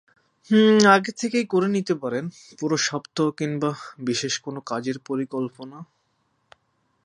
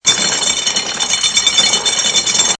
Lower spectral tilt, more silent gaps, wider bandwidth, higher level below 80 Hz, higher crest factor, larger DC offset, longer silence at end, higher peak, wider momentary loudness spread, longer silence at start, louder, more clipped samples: first, -4.5 dB/octave vs 1 dB/octave; neither; about the same, 10.5 kHz vs 11 kHz; second, -70 dBFS vs -48 dBFS; first, 22 dB vs 14 dB; neither; first, 1.2 s vs 0.05 s; about the same, 0 dBFS vs 0 dBFS; first, 15 LU vs 5 LU; first, 0.5 s vs 0.05 s; second, -23 LUFS vs -12 LUFS; neither